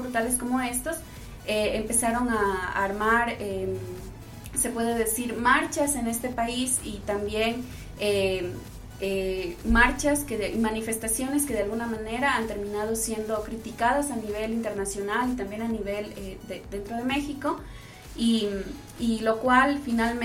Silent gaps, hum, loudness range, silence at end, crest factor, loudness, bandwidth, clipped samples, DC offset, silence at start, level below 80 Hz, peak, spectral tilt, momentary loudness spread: none; none; 4 LU; 0 s; 22 dB; -27 LUFS; 16.5 kHz; under 0.1%; under 0.1%; 0 s; -42 dBFS; -4 dBFS; -3.5 dB/octave; 14 LU